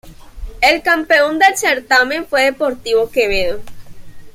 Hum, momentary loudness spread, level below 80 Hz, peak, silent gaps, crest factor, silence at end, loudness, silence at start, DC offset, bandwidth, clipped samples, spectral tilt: none; 7 LU; -36 dBFS; 0 dBFS; none; 16 dB; 0.05 s; -14 LUFS; 0.05 s; under 0.1%; 16.5 kHz; under 0.1%; -2 dB/octave